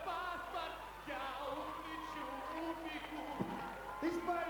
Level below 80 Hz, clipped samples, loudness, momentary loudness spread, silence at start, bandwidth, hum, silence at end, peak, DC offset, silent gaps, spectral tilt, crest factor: -62 dBFS; under 0.1%; -43 LUFS; 5 LU; 0 s; 19.5 kHz; 50 Hz at -60 dBFS; 0 s; -26 dBFS; under 0.1%; none; -5 dB/octave; 18 dB